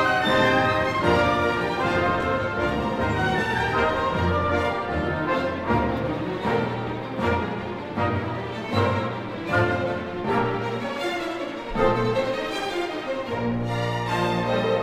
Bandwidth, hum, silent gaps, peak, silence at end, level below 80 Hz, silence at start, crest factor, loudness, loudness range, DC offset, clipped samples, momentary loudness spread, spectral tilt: 15.5 kHz; none; none; -6 dBFS; 0 s; -42 dBFS; 0 s; 18 dB; -24 LUFS; 3 LU; under 0.1%; under 0.1%; 8 LU; -6 dB/octave